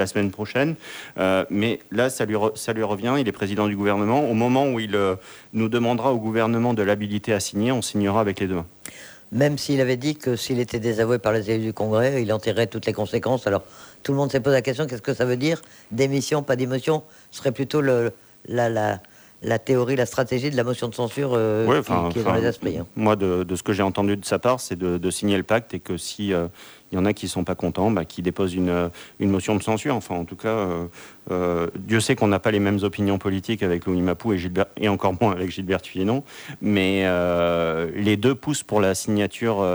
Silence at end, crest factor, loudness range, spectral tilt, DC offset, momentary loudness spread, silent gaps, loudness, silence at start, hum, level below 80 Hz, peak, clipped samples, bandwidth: 0 s; 16 dB; 2 LU; -5.5 dB/octave; under 0.1%; 7 LU; none; -23 LUFS; 0 s; none; -54 dBFS; -6 dBFS; under 0.1%; over 20 kHz